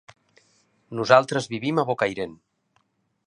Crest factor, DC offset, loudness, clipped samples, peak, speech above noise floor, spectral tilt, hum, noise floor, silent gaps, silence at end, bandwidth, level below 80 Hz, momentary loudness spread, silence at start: 24 dB; under 0.1%; -22 LUFS; under 0.1%; 0 dBFS; 47 dB; -5 dB/octave; none; -69 dBFS; none; 0.95 s; 11 kHz; -66 dBFS; 16 LU; 0.9 s